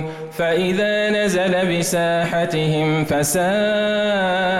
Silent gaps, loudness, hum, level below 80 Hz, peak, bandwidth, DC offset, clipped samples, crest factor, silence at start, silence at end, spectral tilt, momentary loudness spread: none; -18 LUFS; none; -48 dBFS; -10 dBFS; 16.5 kHz; under 0.1%; under 0.1%; 8 dB; 0 s; 0 s; -4.5 dB/octave; 2 LU